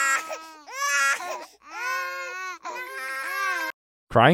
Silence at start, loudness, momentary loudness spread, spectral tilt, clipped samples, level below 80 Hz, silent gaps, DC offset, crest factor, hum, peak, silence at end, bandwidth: 0 s; -27 LUFS; 14 LU; -3.5 dB/octave; under 0.1%; -58 dBFS; 3.74-4.07 s; under 0.1%; 24 dB; none; -2 dBFS; 0 s; 17 kHz